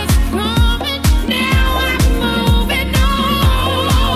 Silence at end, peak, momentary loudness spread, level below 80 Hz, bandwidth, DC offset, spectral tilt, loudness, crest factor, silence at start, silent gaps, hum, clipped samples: 0 s; -2 dBFS; 2 LU; -16 dBFS; 16 kHz; under 0.1%; -5 dB/octave; -15 LUFS; 12 dB; 0 s; none; none; under 0.1%